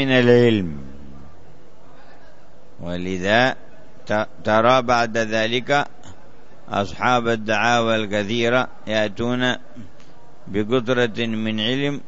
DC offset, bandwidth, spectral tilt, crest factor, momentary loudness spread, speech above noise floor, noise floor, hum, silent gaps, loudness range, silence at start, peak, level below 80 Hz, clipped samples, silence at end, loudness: 3%; 8 kHz; -5.5 dB/octave; 20 dB; 13 LU; 30 dB; -50 dBFS; none; none; 5 LU; 0 s; -2 dBFS; -52 dBFS; under 0.1%; 0.1 s; -20 LUFS